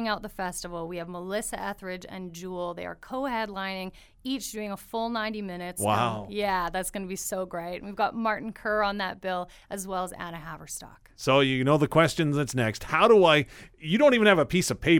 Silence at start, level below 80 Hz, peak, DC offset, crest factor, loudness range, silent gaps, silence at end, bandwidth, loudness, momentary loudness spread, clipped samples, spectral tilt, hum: 0 s; -52 dBFS; -6 dBFS; under 0.1%; 20 dB; 11 LU; none; 0 s; 19 kHz; -27 LUFS; 17 LU; under 0.1%; -4.5 dB/octave; none